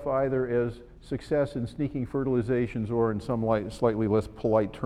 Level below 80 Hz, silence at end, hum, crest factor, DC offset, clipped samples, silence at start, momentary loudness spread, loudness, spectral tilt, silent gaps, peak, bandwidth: -48 dBFS; 0 s; none; 18 dB; under 0.1%; under 0.1%; 0 s; 6 LU; -28 LUFS; -8.5 dB/octave; none; -10 dBFS; 11.5 kHz